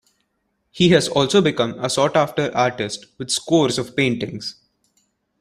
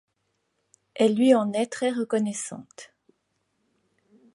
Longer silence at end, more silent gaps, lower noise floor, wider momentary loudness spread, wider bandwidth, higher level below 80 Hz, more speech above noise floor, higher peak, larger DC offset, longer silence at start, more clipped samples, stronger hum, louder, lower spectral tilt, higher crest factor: second, 0.9 s vs 1.5 s; neither; second, -71 dBFS vs -75 dBFS; second, 12 LU vs 21 LU; first, 14.5 kHz vs 11.5 kHz; first, -56 dBFS vs -78 dBFS; about the same, 52 dB vs 52 dB; first, -2 dBFS vs -8 dBFS; neither; second, 0.75 s vs 0.95 s; neither; neither; first, -19 LUFS vs -24 LUFS; about the same, -4.5 dB/octave vs -5 dB/octave; about the same, 18 dB vs 20 dB